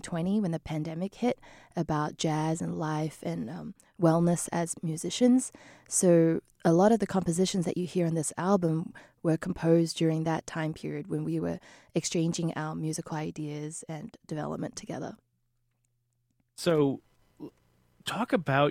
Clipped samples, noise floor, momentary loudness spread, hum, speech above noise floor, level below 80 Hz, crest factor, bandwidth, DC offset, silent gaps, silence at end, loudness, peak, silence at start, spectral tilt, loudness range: under 0.1%; -75 dBFS; 15 LU; none; 47 dB; -62 dBFS; 20 dB; 15 kHz; under 0.1%; none; 0 s; -29 LUFS; -10 dBFS; 0.05 s; -5.5 dB/octave; 9 LU